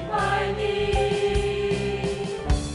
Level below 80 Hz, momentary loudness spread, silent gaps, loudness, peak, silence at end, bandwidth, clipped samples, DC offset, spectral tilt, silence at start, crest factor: -32 dBFS; 4 LU; none; -25 LUFS; -10 dBFS; 0 s; 11.5 kHz; under 0.1%; under 0.1%; -5.5 dB/octave; 0 s; 14 dB